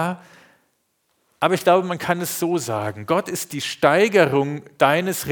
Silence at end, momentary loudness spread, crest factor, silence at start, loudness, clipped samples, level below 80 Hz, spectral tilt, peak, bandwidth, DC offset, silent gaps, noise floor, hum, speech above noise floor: 0 s; 11 LU; 20 dB; 0 s; -20 LUFS; under 0.1%; -64 dBFS; -4.5 dB/octave; 0 dBFS; over 20 kHz; under 0.1%; none; -69 dBFS; none; 49 dB